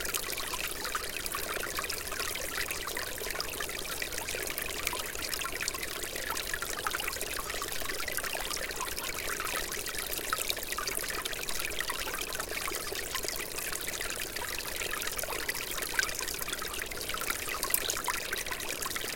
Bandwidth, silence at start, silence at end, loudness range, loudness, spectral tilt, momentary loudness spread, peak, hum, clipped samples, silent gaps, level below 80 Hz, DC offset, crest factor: 17 kHz; 0 s; 0 s; 2 LU; -33 LUFS; -0.5 dB/octave; 3 LU; -8 dBFS; none; under 0.1%; none; -50 dBFS; under 0.1%; 28 dB